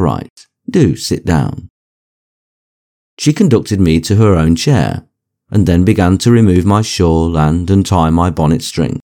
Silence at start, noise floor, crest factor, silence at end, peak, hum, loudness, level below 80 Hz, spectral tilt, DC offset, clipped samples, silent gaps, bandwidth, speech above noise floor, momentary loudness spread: 0 s; under -90 dBFS; 12 dB; 0.05 s; 0 dBFS; none; -12 LUFS; -30 dBFS; -6.5 dB/octave; under 0.1%; 0.1%; 0.30-0.36 s, 1.70-3.17 s; 17 kHz; over 79 dB; 8 LU